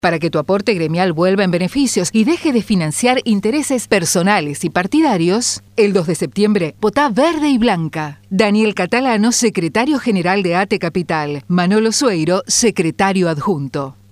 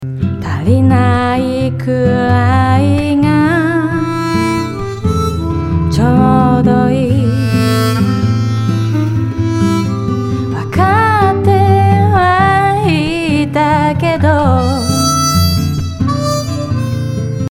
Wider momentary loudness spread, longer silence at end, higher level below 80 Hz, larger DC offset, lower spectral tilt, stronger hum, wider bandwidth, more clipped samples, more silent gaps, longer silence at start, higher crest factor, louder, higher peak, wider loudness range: about the same, 5 LU vs 7 LU; first, 0.2 s vs 0.05 s; second, -50 dBFS vs -34 dBFS; neither; second, -4.5 dB/octave vs -6.5 dB/octave; neither; second, 15.5 kHz vs 17.5 kHz; neither; neither; about the same, 0.05 s vs 0 s; about the same, 14 dB vs 12 dB; second, -15 LUFS vs -12 LUFS; about the same, 0 dBFS vs 0 dBFS; about the same, 1 LU vs 3 LU